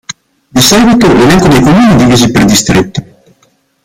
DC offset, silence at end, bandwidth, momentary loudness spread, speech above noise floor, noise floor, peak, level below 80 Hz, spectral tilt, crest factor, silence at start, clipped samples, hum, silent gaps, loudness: under 0.1%; 0.8 s; 19.5 kHz; 13 LU; 47 dB; -51 dBFS; 0 dBFS; -28 dBFS; -4.5 dB/octave; 6 dB; 0.55 s; 0.5%; none; none; -5 LUFS